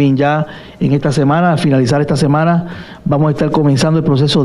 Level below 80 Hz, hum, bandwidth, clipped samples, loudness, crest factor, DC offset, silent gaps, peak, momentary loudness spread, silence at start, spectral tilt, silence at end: -42 dBFS; none; 11.5 kHz; under 0.1%; -13 LUFS; 10 dB; under 0.1%; none; -2 dBFS; 6 LU; 0 s; -7 dB/octave; 0 s